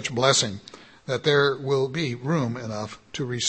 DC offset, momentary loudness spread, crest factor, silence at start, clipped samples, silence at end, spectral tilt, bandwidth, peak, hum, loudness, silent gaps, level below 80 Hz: under 0.1%; 14 LU; 20 dB; 0 s; under 0.1%; 0 s; -4 dB/octave; 8.8 kHz; -6 dBFS; none; -24 LUFS; none; -62 dBFS